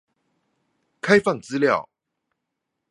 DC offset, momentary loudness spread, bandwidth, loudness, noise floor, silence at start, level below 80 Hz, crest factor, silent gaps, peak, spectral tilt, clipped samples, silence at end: under 0.1%; 7 LU; 11 kHz; -21 LUFS; -81 dBFS; 1.05 s; -64 dBFS; 24 dB; none; -2 dBFS; -5.5 dB/octave; under 0.1%; 1.1 s